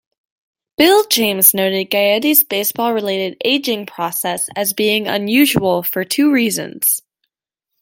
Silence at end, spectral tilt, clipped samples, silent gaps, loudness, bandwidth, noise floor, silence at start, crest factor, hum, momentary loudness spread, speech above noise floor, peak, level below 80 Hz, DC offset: 0.85 s; -2.5 dB/octave; under 0.1%; none; -15 LUFS; 17 kHz; -79 dBFS; 0.8 s; 16 dB; none; 9 LU; 64 dB; 0 dBFS; -58 dBFS; under 0.1%